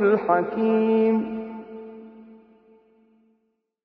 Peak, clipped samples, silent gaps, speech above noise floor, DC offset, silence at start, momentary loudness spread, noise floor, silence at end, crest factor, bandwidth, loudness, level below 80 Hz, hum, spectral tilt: -6 dBFS; under 0.1%; none; 52 dB; under 0.1%; 0 s; 21 LU; -72 dBFS; 1.5 s; 18 dB; 4.7 kHz; -22 LUFS; -66 dBFS; none; -10 dB/octave